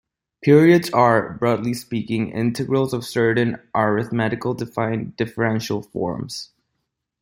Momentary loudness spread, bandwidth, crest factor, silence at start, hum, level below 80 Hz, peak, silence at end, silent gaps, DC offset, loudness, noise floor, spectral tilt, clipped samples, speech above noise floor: 11 LU; 16.5 kHz; 18 dB; 0.4 s; none; -56 dBFS; -2 dBFS; 0.75 s; none; under 0.1%; -20 LUFS; -77 dBFS; -6.5 dB/octave; under 0.1%; 57 dB